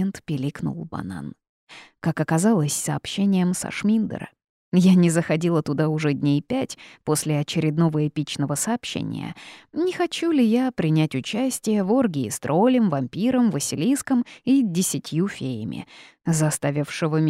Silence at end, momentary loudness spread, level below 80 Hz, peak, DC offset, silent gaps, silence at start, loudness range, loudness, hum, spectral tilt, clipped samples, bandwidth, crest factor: 0 s; 13 LU; -60 dBFS; -8 dBFS; under 0.1%; 1.49-1.67 s, 4.49-4.72 s; 0 s; 3 LU; -23 LUFS; none; -5.5 dB/octave; under 0.1%; 16 kHz; 16 dB